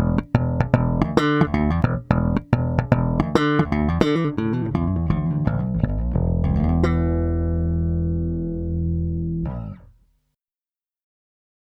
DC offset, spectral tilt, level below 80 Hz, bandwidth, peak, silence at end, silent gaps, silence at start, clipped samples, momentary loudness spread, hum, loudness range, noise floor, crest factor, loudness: under 0.1%; -8.5 dB/octave; -30 dBFS; 8.2 kHz; -2 dBFS; 1.75 s; none; 0 s; under 0.1%; 6 LU; none; 6 LU; under -90 dBFS; 20 dB; -22 LUFS